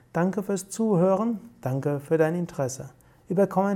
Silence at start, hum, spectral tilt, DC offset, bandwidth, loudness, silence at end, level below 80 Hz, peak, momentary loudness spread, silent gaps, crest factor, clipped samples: 0.15 s; none; -7 dB/octave; under 0.1%; 16.5 kHz; -26 LUFS; 0 s; -64 dBFS; -10 dBFS; 9 LU; none; 16 dB; under 0.1%